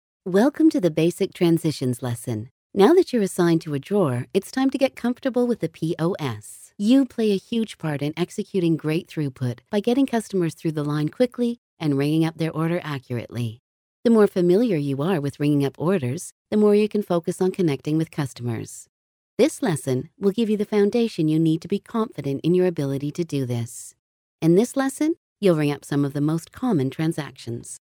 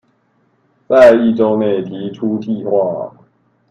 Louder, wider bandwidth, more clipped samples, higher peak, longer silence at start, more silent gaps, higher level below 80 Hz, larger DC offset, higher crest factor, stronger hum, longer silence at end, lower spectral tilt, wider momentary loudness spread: second, -23 LUFS vs -13 LUFS; first, 17.5 kHz vs 8.6 kHz; second, under 0.1% vs 0.2%; second, -4 dBFS vs 0 dBFS; second, 0.25 s vs 0.9 s; first, 2.51-2.70 s, 11.58-11.77 s, 13.59-14.03 s, 16.32-16.45 s, 18.89-19.37 s, 23.99-24.39 s, 25.17-25.36 s vs none; second, -64 dBFS vs -54 dBFS; neither; about the same, 18 dB vs 14 dB; neither; second, 0.15 s vs 0.6 s; about the same, -6.5 dB/octave vs -7.5 dB/octave; second, 11 LU vs 16 LU